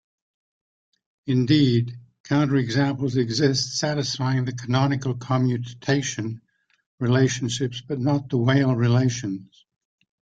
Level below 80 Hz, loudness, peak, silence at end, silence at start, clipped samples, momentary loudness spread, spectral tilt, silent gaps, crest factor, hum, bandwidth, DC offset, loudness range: -58 dBFS; -23 LUFS; -6 dBFS; 0.9 s; 1.25 s; under 0.1%; 10 LU; -5.5 dB/octave; 2.20-2.24 s, 6.86-6.98 s; 18 dB; none; 8.4 kHz; under 0.1%; 3 LU